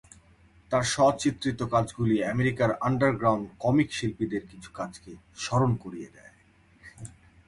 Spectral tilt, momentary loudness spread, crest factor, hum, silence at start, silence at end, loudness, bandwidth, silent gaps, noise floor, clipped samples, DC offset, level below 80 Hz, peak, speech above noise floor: -5.5 dB/octave; 22 LU; 18 dB; none; 0.7 s; 0.4 s; -27 LUFS; 11.5 kHz; none; -60 dBFS; under 0.1%; under 0.1%; -54 dBFS; -10 dBFS; 33 dB